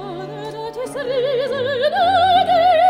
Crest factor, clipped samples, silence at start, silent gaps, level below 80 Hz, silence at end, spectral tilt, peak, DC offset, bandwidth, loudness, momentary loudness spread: 12 dB; under 0.1%; 0 s; none; -56 dBFS; 0 s; -4.5 dB/octave; -6 dBFS; under 0.1%; 13.5 kHz; -17 LUFS; 15 LU